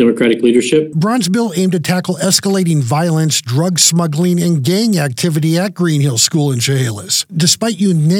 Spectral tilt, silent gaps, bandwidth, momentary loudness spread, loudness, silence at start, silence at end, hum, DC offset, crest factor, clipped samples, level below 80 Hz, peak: -4.5 dB/octave; none; 17 kHz; 4 LU; -13 LUFS; 0 s; 0 s; none; under 0.1%; 12 dB; under 0.1%; -62 dBFS; 0 dBFS